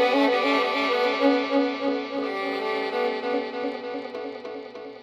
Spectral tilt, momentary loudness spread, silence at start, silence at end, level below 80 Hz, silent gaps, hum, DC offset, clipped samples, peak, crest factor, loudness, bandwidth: -4 dB/octave; 14 LU; 0 s; 0 s; -72 dBFS; none; none; under 0.1%; under 0.1%; -8 dBFS; 16 dB; -25 LUFS; 12.5 kHz